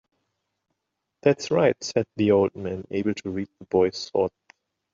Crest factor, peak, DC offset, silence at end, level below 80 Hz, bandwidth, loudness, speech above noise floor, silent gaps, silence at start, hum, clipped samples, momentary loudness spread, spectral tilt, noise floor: 20 dB; -6 dBFS; under 0.1%; 0.65 s; -66 dBFS; 7.6 kHz; -24 LUFS; 58 dB; none; 1.25 s; none; under 0.1%; 9 LU; -6 dB/octave; -81 dBFS